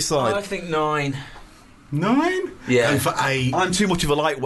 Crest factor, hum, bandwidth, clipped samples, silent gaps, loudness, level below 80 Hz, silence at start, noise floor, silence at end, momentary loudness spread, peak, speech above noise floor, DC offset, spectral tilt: 14 dB; none; 12.5 kHz; under 0.1%; none; -21 LUFS; -44 dBFS; 0 s; -46 dBFS; 0 s; 8 LU; -8 dBFS; 25 dB; under 0.1%; -4.5 dB/octave